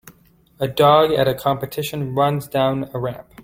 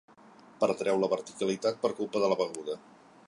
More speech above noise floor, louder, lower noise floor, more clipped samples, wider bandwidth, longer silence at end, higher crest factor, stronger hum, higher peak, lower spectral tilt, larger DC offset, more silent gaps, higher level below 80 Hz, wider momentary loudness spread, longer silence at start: first, 35 dB vs 26 dB; first, -19 LUFS vs -30 LUFS; about the same, -53 dBFS vs -55 dBFS; neither; first, 16.5 kHz vs 11.5 kHz; second, 0 s vs 0.5 s; about the same, 18 dB vs 18 dB; neither; first, -2 dBFS vs -14 dBFS; about the same, -6 dB/octave vs -5 dB/octave; neither; neither; first, -52 dBFS vs -76 dBFS; first, 13 LU vs 9 LU; second, 0.05 s vs 0.6 s